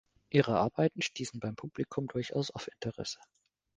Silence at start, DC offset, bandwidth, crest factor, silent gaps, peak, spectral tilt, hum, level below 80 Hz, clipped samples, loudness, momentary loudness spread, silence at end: 0.3 s; under 0.1%; 9.8 kHz; 26 dB; none; -10 dBFS; -5.5 dB/octave; none; -66 dBFS; under 0.1%; -34 LUFS; 12 LU; 0.6 s